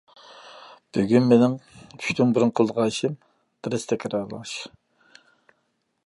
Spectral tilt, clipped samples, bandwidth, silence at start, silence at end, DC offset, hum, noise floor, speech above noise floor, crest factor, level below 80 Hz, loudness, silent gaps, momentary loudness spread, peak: -6 dB/octave; under 0.1%; 11.5 kHz; 0.45 s; 1.4 s; under 0.1%; none; -73 dBFS; 51 dB; 20 dB; -64 dBFS; -23 LUFS; none; 22 LU; -4 dBFS